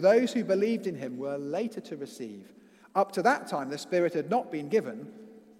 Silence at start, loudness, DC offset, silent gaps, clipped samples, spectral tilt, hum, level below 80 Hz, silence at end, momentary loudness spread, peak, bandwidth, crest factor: 0 s; -29 LUFS; under 0.1%; none; under 0.1%; -5.5 dB/octave; none; -82 dBFS; 0.2 s; 15 LU; -10 dBFS; 15.5 kHz; 18 dB